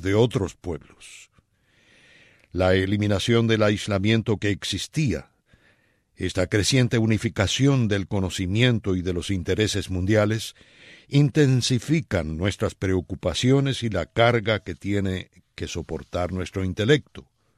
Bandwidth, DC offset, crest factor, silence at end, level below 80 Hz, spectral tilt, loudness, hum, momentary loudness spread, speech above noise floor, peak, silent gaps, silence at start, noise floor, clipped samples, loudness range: 14 kHz; under 0.1%; 18 dB; 0.35 s; -46 dBFS; -5.5 dB/octave; -23 LUFS; none; 12 LU; 40 dB; -6 dBFS; none; 0 s; -63 dBFS; under 0.1%; 3 LU